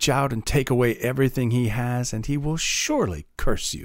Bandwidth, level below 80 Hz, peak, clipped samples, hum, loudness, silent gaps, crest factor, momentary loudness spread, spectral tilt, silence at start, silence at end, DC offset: 16 kHz; -34 dBFS; -6 dBFS; under 0.1%; none; -24 LUFS; none; 16 dB; 5 LU; -4.5 dB/octave; 0 s; 0 s; under 0.1%